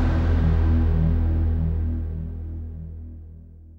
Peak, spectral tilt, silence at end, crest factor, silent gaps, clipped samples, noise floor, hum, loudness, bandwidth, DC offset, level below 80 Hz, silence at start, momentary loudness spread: -12 dBFS; -10 dB/octave; 0 s; 12 dB; none; under 0.1%; -43 dBFS; none; -24 LUFS; 4.7 kHz; under 0.1%; -26 dBFS; 0 s; 18 LU